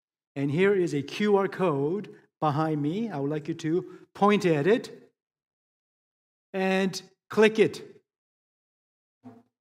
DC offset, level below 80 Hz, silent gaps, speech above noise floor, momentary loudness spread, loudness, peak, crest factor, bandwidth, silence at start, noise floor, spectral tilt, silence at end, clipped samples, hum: under 0.1%; -76 dBFS; 5.47-6.53 s, 8.18-9.21 s; over 65 dB; 14 LU; -26 LUFS; -6 dBFS; 22 dB; 13.5 kHz; 0.35 s; under -90 dBFS; -6.5 dB/octave; 0.3 s; under 0.1%; none